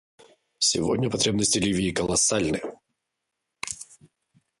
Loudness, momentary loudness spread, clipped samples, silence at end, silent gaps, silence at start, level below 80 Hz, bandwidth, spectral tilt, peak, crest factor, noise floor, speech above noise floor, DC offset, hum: -24 LUFS; 16 LU; under 0.1%; 0.75 s; none; 0.6 s; -52 dBFS; 11.5 kHz; -3 dB/octave; -10 dBFS; 18 dB; -82 dBFS; 58 dB; under 0.1%; none